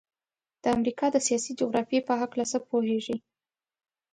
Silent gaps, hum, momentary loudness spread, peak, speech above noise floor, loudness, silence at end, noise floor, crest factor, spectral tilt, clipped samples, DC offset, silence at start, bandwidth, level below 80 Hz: none; none; 5 LU; -10 dBFS; over 63 dB; -28 LUFS; 0.95 s; under -90 dBFS; 18 dB; -3.5 dB/octave; under 0.1%; under 0.1%; 0.65 s; 10.5 kHz; -66 dBFS